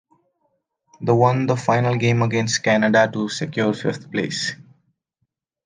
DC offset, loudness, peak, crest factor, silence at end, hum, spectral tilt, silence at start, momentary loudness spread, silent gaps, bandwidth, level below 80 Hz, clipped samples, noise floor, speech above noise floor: under 0.1%; -20 LUFS; -2 dBFS; 18 dB; 1.1 s; none; -5.5 dB/octave; 1 s; 9 LU; none; 9.8 kHz; -64 dBFS; under 0.1%; -75 dBFS; 56 dB